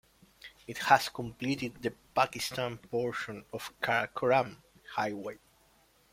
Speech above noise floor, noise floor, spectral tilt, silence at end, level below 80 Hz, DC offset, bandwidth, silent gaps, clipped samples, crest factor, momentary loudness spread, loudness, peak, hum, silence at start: 34 dB; -66 dBFS; -4 dB/octave; 0.75 s; -66 dBFS; under 0.1%; 16.5 kHz; none; under 0.1%; 26 dB; 16 LU; -32 LUFS; -8 dBFS; none; 0.45 s